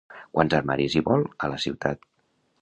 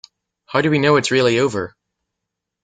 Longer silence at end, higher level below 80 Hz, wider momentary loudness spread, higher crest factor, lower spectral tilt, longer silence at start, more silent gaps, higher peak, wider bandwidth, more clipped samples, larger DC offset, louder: second, 0.65 s vs 0.95 s; first, -52 dBFS vs -58 dBFS; second, 7 LU vs 10 LU; first, 24 dB vs 18 dB; about the same, -6 dB/octave vs -5 dB/octave; second, 0.1 s vs 0.5 s; neither; about the same, -2 dBFS vs -2 dBFS; about the same, 9.8 kHz vs 9.4 kHz; neither; neither; second, -25 LUFS vs -17 LUFS